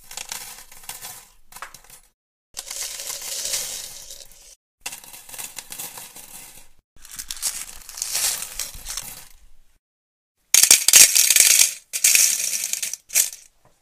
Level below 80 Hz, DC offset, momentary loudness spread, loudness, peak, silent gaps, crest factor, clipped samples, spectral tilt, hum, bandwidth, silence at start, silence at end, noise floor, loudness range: -52 dBFS; under 0.1%; 26 LU; -16 LUFS; 0 dBFS; 2.14-2.54 s, 4.56-4.78 s, 6.84-6.96 s, 9.79-10.35 s; 24 dB; under 0.1%; 3 dB/octave; none; 16 kHz; 0.1 s; 0.45 s; -46 dBFS; 20 LU